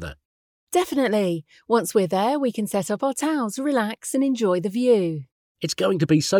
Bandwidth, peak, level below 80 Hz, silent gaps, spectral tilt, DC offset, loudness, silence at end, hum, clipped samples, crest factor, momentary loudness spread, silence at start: 19.5 kHz; -6 dBFS; -56 dBFS; 0.25-0.67 s, 5.32-5.55 s; -5 dB/octave; under 0.1%; -23 LUFS; 0 s; none; under 0.1%; 16 dB; 7 LU; 0 s